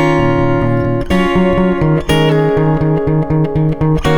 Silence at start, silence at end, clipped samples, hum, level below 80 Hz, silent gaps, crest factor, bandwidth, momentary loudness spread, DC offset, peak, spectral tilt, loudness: 0 s; 0 s; under 0.1%; none; -26 dBFS; none; 10 dB; 17 kHz; 3 LU; under 0.1%; -2 dBFS; -7.5 dB/octave; -13 LUFS